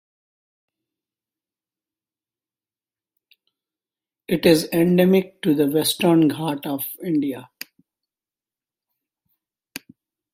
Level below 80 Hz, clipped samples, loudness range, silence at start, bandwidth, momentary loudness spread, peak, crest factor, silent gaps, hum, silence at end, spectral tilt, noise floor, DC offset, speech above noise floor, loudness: -62 dBFS; under 0.1%; 12 LU; 4.3 s; 16 kHz; 22 LU; -2 dBFS; 22 dB; none; none; 0.55 s; -5.5 dB/octave; under -90 dBFS; under 0.1%; over 71 dB; -20 LUFS